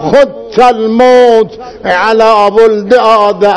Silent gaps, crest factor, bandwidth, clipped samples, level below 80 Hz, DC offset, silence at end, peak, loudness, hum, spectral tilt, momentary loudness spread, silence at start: none; 6 dB; 11 kHz; 9%; -42 dBFS; 0.9%; 0 s; 0 dBFS; -7 LUFS; none; -5 dB/octave; 6 LU; 0 s